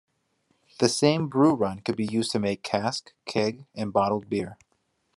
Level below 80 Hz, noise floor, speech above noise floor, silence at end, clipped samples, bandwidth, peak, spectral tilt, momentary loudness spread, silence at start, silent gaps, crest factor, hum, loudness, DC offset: -68 dBFS; -72 dBFS; 47 dB; 0.6 s; under 0.1%; 12.5 kHz; -6 dBFS; -5 dB/octave; 9 LU; 0.8 s; none; 22 dB; none; -26 LUFS; under 0.1%